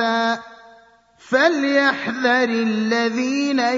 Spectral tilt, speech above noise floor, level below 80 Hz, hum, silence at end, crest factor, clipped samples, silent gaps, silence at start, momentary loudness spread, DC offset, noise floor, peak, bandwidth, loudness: -4 dB/octave; 33 dB; -68 dBFS; none; 0 s; 16 dB; under 0.1%; none; 0 s; 5 LU; under 0.1%; -51 dBFS; -4 dBFS; 7.8 kHz; -19 LUFS